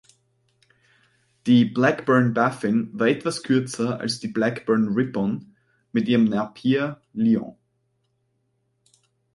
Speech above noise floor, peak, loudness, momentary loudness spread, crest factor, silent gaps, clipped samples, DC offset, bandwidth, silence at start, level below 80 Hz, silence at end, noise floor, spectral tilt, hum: 50 dB; -4 dBFS; -22 LUFS; 8 LU; 20 dB; none; under 0.1%; under 0.1%; 11.5 kHz; 1.45 s; -64 dBFS; 1.85 s; -71 dBFS; -6.5 dB/octave; none